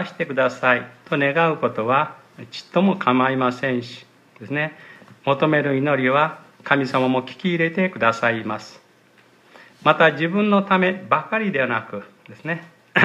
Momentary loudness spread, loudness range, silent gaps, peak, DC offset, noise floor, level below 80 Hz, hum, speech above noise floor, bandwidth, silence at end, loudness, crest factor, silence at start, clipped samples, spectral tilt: 11 LU; 2 LU; none; 0 dBFS; under 0.1%; -54 dBFS; -70 dBFS; none; 34 dB; 10 kHz; 0 s; -20 LUFS; 20 dB; 0 s; under 0.1%; -6.5 dB/octave